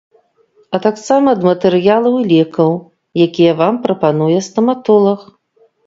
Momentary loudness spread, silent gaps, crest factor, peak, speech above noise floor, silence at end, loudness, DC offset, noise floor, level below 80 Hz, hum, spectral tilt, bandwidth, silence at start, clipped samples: 5 LU; none; 14 dB; 0 dBFS; 42 dB; 0.65 s; -13 LUFS; under 0.1%; -54 dBFS; -60 dBFS; none; -7 dB/octave; 7.8 kHz; 0.7 s; under 0.1%